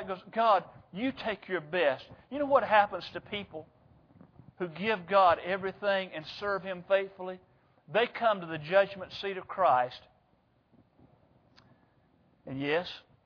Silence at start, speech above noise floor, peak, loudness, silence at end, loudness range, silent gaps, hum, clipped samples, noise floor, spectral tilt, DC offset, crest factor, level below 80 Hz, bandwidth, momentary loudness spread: 0 s; 39 dB; -10 dBFS; -30 LUFS; 0.25 s; 5 LU; none; none; under 0.1%; -69 dBFS; -6.5 dB/octave; under 0.1%; 22 dB; -68 dBFS; 5.4 kHz; 15 LU